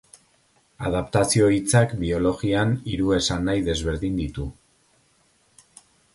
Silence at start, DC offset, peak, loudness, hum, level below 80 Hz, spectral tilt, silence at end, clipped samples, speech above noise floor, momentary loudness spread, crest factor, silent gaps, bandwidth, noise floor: 0.8 s; under 0.1%; -4 dBFS; -23 LUFS; none; -40 dBFS; -5 dB/octave; 1.6 s; under 0.1%; 41 dB; 10 LU; 20 dB; none; 11.5 kHz; -63 dBFS